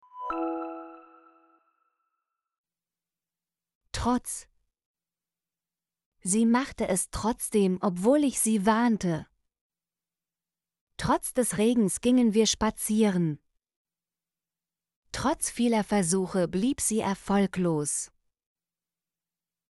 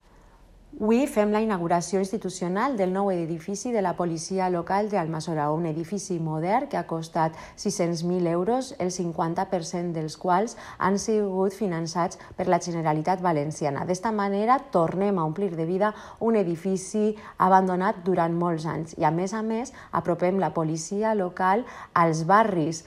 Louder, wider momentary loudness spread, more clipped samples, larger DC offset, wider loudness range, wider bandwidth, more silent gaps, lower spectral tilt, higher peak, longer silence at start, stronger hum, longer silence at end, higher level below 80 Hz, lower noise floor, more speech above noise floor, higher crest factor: about the same, -26 LUFS vs -26 LUFS; first, 12 LU vs 7 LU; neither; neither; first, 11 LU vs 3 LU; second, 12 kHz vs 13.5 kHz; first, 2.58-2.64 s, 3.75-3.81 s, 4.85-4.94 s, 6.06-6.12 s, 9.61-9.70 s, 10.81-10.87 s, 13.76-13.85 s, 14.96-15.02 s vs none; second, -4.5 dB/octave vs -6 dB/octave; second, -10 dBFS vs -6 dBFS; second, 0.15 s vs 0.7 s; neither; first, 1.65 s vs 0.05 s; first, -52 dBFS vs -58 dBFS; first, under -90 dBFS vs -53 dBFS; first, over 64 dB vs 28 dB; about the same, 18 dB vs 20 dB